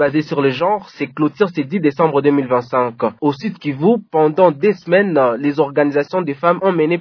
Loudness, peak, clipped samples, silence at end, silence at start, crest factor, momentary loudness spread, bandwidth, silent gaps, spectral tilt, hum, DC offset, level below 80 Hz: -16 LUFS; 0 dBFS; under 0.1%; 0 s; 0 s; 16 dB; 6 LU; 5.4 kHz; none; -8.5 dB/octave; none; under 0.1%; -64 dBFS